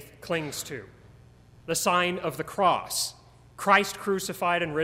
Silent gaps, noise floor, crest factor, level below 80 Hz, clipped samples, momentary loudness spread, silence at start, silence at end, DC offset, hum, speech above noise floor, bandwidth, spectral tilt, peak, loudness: none; -53 dBFS; 22 dB; -60 dBFS; under 0.1%; 12 LU; 0 s; 0 s; under 0.1%; none; 27 dB; 16 kHz; -3 dB/octave; -6 dBFS; -26 LUFS